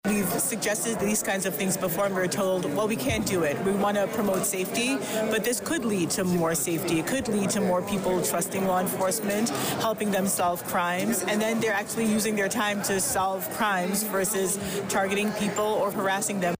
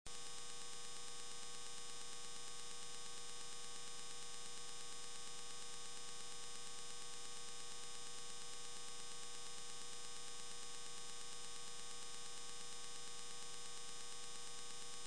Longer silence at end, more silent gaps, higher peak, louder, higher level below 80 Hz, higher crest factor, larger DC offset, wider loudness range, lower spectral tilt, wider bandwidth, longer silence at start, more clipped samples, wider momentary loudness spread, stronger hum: about the same, 0.05 s vs 0 s; neither; first, -16 dBFS vs -30 dBFS; first, -26 LUFS vs -51 LUFS; first, -56 dBFS vs -76 dBFS; second, 10 dB vs 24 dB; second, under 0.1% vs 0.5%; about the same, 0 LU vs 0 LU; first, -4 dB/octave vs -0.5 dB/octave; first, 16 kHz vs 11 kHz; about the same, 0.05 s vs 0.05 s; neither; about the same, 2 LU vs 0 LU; neither